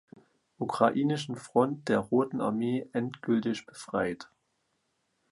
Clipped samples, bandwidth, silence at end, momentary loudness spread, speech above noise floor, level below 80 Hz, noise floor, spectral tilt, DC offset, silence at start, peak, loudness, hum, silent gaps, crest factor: under 0.1%; 11.5 kHz; 1.05 s; 9 LU; 48 dB; -68 dBFS; -77 dBFS; -6.5 dB/octave; under 0.1%; 0.6 s; -8 dBFS; -30 LUFS; none; none; 22 dB